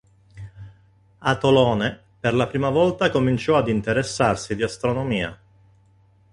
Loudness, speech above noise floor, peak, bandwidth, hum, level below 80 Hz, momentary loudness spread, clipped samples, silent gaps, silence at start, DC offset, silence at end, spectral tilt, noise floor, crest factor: -21 LUFS; 36 dB; -4 dBFS; 11.5 kHz; none; -48 dBFS; 11 LU; under 0.1%; none; 0.35 s; under 0.1%; 1 s; -6 dB/octave; -57 dBFS; 18 dB